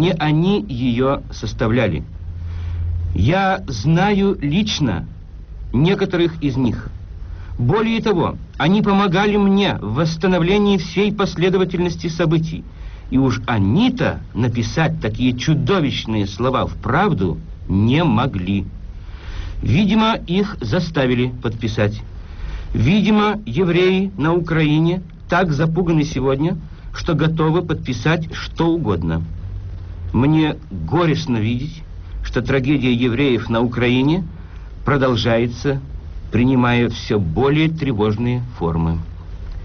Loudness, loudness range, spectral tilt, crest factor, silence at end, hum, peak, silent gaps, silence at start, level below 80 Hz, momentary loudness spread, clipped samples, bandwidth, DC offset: -18 LUFS; 3 LU; -6 dB/octave; 12 dB; 0 s; none; -6 dBFS; none; 0 s; -32 dBFS; 15 LU; under 0.1%; 6.6 kHz; under 0.1%